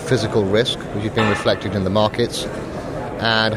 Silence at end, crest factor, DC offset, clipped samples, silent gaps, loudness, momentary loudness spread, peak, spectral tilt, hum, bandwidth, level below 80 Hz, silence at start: 0 s; 18 dB; under 0.1%; under 0.1%; none; -20 LUFS; 10 LU; -2 dBFS; -5 dB/octave; none; 15 kHz; -42 dBFS; 0 s